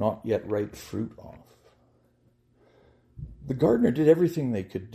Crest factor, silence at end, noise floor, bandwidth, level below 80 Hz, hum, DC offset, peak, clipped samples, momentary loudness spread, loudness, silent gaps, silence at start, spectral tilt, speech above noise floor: 20 dB; 0 s; -65 dBFS; 15 kHz; -56 dBFS; none; under 0.1%; -8 dBFS; under 0.1%; 22 LU; -26 LUFS; none; 0 s; -8 dB/octave; 39 dB